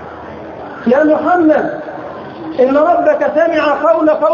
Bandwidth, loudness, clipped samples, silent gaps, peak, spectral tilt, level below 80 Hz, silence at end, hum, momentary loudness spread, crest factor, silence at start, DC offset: 7 kHz; -12 LUFS; under 0.1%; none; 0 dBFS; -7 dB/octave; -50 dBFS; 0 s; none; 17 LU; 12 dB; 0 s; under 0.1%